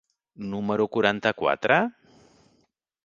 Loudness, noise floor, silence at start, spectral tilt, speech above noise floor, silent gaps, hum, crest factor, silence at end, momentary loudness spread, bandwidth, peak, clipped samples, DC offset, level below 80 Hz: -24 LUFS; -69 dBFS; 0.4 s; -6 dB/octave; 45 dB; none; none; 24 dB; 1.15 s; 11 LU; 7.4 kHz; -2 dBFS; under 0.1%; under 0.1%; -64 dBFS